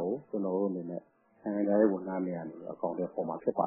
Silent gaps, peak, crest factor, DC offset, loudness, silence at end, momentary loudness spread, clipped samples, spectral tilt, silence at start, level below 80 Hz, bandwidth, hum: none; -12 dBFS; 20 dB; under 0.1%; -33 LUFS; 0 s; 15 LU; under 0.1%; -5.5 dB/octave; 0 s; -76 dBFS; 2.6 kHz; none